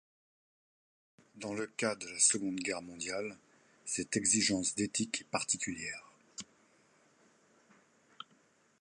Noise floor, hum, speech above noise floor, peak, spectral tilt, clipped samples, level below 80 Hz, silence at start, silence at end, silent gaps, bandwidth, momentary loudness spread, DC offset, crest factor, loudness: -69 dBFS; none; 34 dB; -14 dBFS; -2 dB/octave; under 0.1%; -72 dBFS; 1.35 s; 0.6 s; none; 11.5 kHz; 21 LU; under 0.1%; 24 dB; -33 LUFS